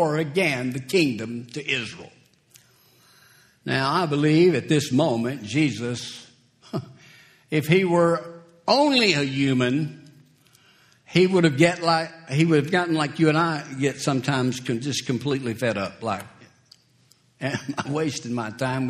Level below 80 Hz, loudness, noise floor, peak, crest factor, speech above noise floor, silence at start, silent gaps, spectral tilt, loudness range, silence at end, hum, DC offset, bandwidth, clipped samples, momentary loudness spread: -62 dBFS; -23 LUFS; -60 dBFS; -2 dBFS; 22 dB; 38 dB; 0 s; none; -5.5 dB/octave; 7 LU; 0 s; none; under 0.1%; 14 kHz; under 0.1%; 13 LU